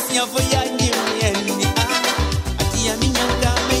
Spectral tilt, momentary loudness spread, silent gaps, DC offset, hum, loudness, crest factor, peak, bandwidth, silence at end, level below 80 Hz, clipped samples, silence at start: -3.5 dB/octave; 3 LU; none; under 0.1%; none; -19 LUFS; 16 dB; -4 dBFS; 16 kHz; 0 s; -28 dBFS; under 0.1%; 0 s